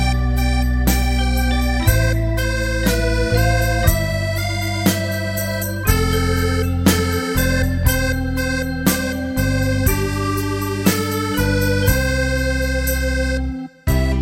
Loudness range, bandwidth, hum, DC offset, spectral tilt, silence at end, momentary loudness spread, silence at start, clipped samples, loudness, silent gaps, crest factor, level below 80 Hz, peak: 1 LU; 17 kHz; none; under 0.1%; -5 dB/octave; 0 s; 4 LU; 0 s; under 0.1%; -19 LUFS; none; 18 dB; -22 dBFS; 0 dBFS